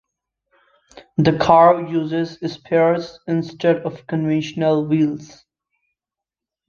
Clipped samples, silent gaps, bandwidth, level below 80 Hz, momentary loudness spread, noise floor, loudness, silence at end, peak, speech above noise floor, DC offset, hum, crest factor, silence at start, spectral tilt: under 0.1%; none; 7.2 kHz; -56 dBFS; 12 LU; -87 dBFS; -18 LUFS; 1.45 s; -2 dBFS; 69 dB; under 0.1%; none; 18 dB; 0.95 s; -7.5 dB/octave